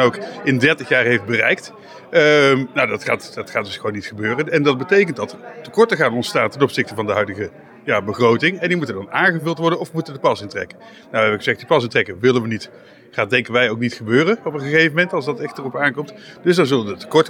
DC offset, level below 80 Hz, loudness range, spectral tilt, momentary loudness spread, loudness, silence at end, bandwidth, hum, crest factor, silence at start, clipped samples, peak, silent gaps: under 0.1%; -64 dBFS; 3 LU; -5.5 dB/octave; 11 LU; -18 LUFS; 0 s; 16 kHz; none; 16 dB; 0 s; under 0.1%; -2 dBFS; none